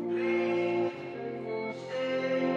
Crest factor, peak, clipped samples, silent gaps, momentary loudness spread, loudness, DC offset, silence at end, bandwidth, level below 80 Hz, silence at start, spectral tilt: 12 dB; -18 dBFS; under 0.1%; none; 9 LU; -32 LUFS; under 0.1%; 0 s; 7.4 kHz; -80 dBFS; 0 s; -6.5 dB/octave